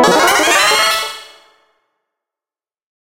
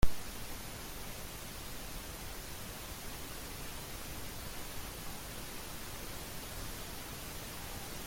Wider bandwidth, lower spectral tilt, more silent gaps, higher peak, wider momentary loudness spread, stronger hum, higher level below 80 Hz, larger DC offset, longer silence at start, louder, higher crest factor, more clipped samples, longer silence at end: about the same, 16 kHz vs 17 kHz; second, -1 dB/octave vs -3 dB/octave; neither; first, 0 dBFS vs -14 dBFS; first, 14 LU vs 1 LU; neither; second, -54 dBFS vs -46 dBFS; neither; about the same, 0 s vs 0 s; first, -11 LUFS vs -44 LUFS; second, 16 dB vs 24 dB; neither; first, 1.9 s vs 0 s